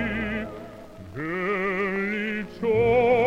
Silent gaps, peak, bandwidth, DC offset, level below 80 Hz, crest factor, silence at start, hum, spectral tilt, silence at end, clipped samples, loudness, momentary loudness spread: none; -10 dBFS; 8.6 kHz; under 0.1%; -48 dBFS; 14 dB; 0 s; none; -7.5 dB/octave; 0 s; under 0.1%; -25 LUFS; 20 LU